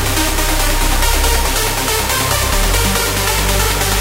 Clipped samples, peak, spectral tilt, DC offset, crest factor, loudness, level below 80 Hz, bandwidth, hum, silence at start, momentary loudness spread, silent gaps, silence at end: under 0.1%; -2 dBFS; -2.5 dB/octave; under 0.1%; 14 dB; -14 LUFS; -18 dBFS; 16.5 kHz; none; 0 s; 1 LU; none; 0 s